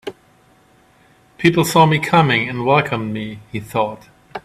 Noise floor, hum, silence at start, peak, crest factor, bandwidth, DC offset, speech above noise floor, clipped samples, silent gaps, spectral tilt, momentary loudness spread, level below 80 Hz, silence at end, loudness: -53 dBFS; none; 0.05 s; 0 dBFS; 18 dB; 15.5 kHz; under 0.1%; 36 dB; under 0.1%; none; -5.5 dB/octave; 15 LU; -54 dBFS; 0.05 s; -17 LUFS